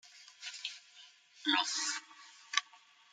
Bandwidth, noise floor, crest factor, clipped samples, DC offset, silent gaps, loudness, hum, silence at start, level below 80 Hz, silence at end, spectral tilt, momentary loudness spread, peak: 11 kHz; -62 dBFS; 28 dB; under 0.1%; under 0.1%; none; -35 LUFS; none; 0.05 s; under -90 dBFS; 0.35 s; 2.5 dB/octave; 24 LU; -12 dBFS